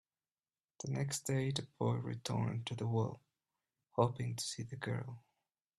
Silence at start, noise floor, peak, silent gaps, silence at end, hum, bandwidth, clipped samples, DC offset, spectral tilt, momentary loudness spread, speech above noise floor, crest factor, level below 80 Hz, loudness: 0.8 s; under -90 dBFS; -18 dBFS; none; 0.6 s; none; 13.5 kHz; under 0.1%; under 0.1%; -5.5 dB/octave; 8 LU; over 52 dB; 22 dB; -72 dBFS; -39 LUFS